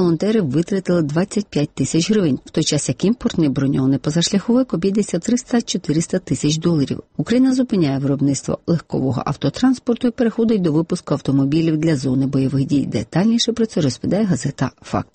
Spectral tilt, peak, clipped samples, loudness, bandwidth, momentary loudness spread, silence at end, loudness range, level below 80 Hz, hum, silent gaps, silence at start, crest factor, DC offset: -6 dB/octave; -6 dBFS; under 0.1%; -19 LUFS; 8.8 kHz; 5 LU; 0.1 s; 1 LU; -48 dBFS; none; none; 0 s; 12 dB; under 0.1%